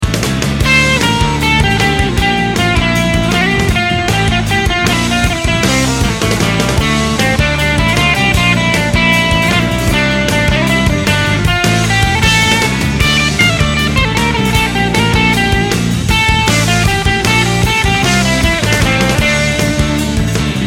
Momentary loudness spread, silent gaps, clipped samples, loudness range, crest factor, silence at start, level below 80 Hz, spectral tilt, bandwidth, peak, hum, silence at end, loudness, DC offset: 3 LU; none; under 0.1%; 1 LU; 12 dB; 0 s; -22 dBFS; -4 dB/octave; 16.5 kHz; 0 dBFS; none; 0 s; -11 LUFS; under 0.1%